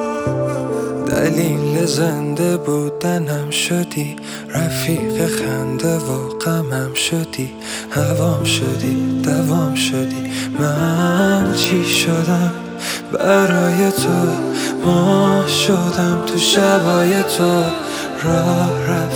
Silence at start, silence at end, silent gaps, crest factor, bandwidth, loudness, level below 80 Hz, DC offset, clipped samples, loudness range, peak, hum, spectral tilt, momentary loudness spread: 0 s; 0 s; none; 16 dB; over 20 kHz; -17 LUFS; -48 dBFS; under 0.1%; under 0.1%; 5 LU; 0 dBFS; none; -5 dB/octave; 8 LU